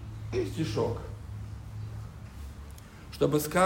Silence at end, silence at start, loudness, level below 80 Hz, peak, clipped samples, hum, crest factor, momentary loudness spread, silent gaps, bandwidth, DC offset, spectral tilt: 0 s; 0 s; -33 LUFS; -46 dBFS; -12 dBFS; under 0.1%; none; 20 dB; 17 LU; none; 16 kHz; under 0.1%; -6 dB/octave